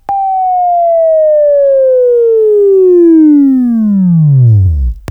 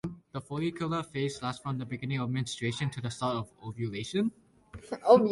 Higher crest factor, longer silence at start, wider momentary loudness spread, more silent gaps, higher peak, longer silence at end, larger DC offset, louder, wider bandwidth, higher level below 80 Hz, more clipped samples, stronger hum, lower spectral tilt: second, 6 dB vs 22 dB; about the same, 0.1 s vs 0.05 s; second, 6 LU vs 9 LU; neither; first, 0 dBFS vs -8 dBFS; about the same, 0.1 s vs 0 s; neither; first, -7 LUFS vs -32 LUFS; second, 2.8 kHz vs 11.5 kHz; first, -24 dBFS vs -62 dBFS; neither; neither; first, -12.5 dB/octave vs -6 dB/octave